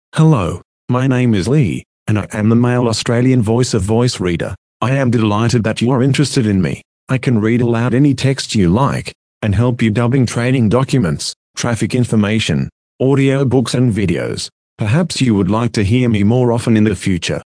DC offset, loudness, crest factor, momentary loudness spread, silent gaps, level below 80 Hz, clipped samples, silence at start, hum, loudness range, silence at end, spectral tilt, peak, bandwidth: under 0.1%; -15 LUFS; 14 dB; 8 LU; 0.65-0.88 s, 1.86-2.06 s, 4.58-4.80 s, 6.85-7.07 s, 9.15-9.41 s, 11.36-11.54 s, 12.72-12.99 s, 14.52-14.76 s; -42 dBFS; under 0.1%; 0.15 s; none; 1 LU; 0.1 s; -6.5 dB/octave; 0 dBFS; 10.5 kHz